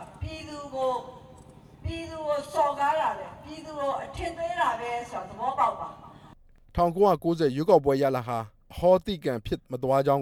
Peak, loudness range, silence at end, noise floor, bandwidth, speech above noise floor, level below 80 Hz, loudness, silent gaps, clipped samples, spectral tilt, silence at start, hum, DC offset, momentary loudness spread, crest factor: -8 dBFS; 6 LU; 0 s; -53 dBFS; 16.5 kHz; 27 dB; -48 dBFS; -27 LUFS; none; under 0.1%; -6.5 dB/octave; 0 s; none; under 0.1%; 16 LU; 20 dB